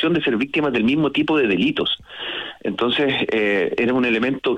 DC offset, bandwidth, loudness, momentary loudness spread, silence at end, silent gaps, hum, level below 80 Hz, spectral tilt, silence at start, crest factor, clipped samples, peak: under 0.1%; 8.8 kHz; -20 LUFS; 8 LU; 0 s; none; none; -54 dBFS; -6.5 dB/octave; 0 s; 10 dB; under 0.1%; -10 dBFS